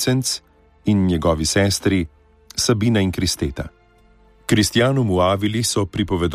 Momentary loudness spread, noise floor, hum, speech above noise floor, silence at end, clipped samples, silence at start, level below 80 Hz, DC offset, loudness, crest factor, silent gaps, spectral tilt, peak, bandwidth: 10 LU; -53 dBFS; none; 34 dB; 0 s; under 0.1%; 0 s; -38 dBFS; under 0.1%; -19 LUFS; 16 dB; none; -4.5 dB/octave; -4 dBFS; 15.5 kHz